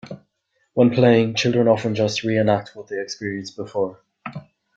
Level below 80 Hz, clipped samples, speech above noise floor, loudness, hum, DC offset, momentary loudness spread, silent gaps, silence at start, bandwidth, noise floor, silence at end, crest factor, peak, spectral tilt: -60 dBFS; under 0.1%; 50 dB; -20 LUFS; none; under 0.1%; 20 LU; none; 0.05 s; 7.8 kHz; -70 dBFS; 0.35 s; 18 dB; -4 dBFS; -6 dB/octave